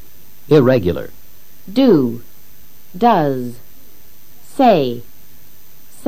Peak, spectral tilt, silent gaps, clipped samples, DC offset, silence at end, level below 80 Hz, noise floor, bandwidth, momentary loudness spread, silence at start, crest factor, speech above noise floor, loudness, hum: 0 dBFS; -7.5 dB/octave; none; under 0.1%; 4%; 1.05 s; -48 dBFS; -46 dBFS; 15.5 kHz; 19 LU; 0.5 s; 18 dB; 32 dB; -15 LUFS; none